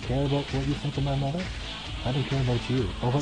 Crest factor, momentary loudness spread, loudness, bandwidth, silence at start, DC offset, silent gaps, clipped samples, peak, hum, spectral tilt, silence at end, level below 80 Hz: 12 dB; 6 LU; -28 LUFS; 10 kHz; 0 s; under 0.1%; none; under 0.1%; -14 dBFS; none; -6.5 dB/octave; 0 s; -38 dBFS